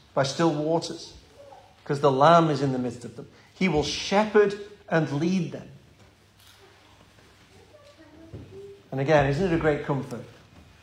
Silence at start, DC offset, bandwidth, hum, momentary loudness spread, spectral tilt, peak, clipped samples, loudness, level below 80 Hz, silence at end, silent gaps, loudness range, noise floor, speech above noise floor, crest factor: 0.15 s; under 0.1%; 11.5 kHz; none; 24 LU; -6 dB/octave; -6 dBFS; under 0.1%; -24 LUFS; -52 dBFS; 0.55 s; none; 9 LU; -56 dBFS; 32 dB; 20 dB